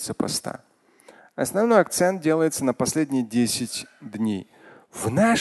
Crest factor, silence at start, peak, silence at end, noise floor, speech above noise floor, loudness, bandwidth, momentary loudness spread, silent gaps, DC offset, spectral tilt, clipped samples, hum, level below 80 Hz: 20 dB; 0 s; -4 dBFS; 0 s; -53 dBFS; 31 dB; -23 LUFS; 12.5 kHz; 16 LU; none; under 0.1%; -4.5 dB/octave; under 0.1%; none; -58 dBFS